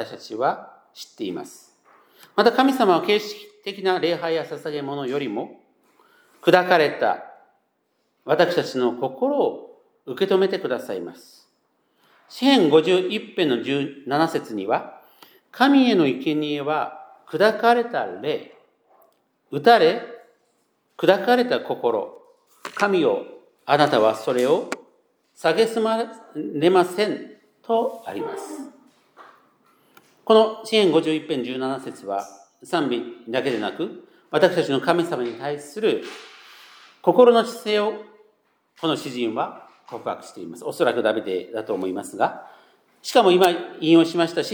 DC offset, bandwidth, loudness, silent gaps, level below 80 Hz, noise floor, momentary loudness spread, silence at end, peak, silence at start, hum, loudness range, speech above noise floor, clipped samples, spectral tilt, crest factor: under 0.1%; over 20 kHz; -21 LUFS; none; -84 dBFS; -70 dBFS; 17 LU; 0 s; 0 dBFS; 0 s; none; 5 LU; 50 dB; under 0.1%; -5 dB/octave; 22 dB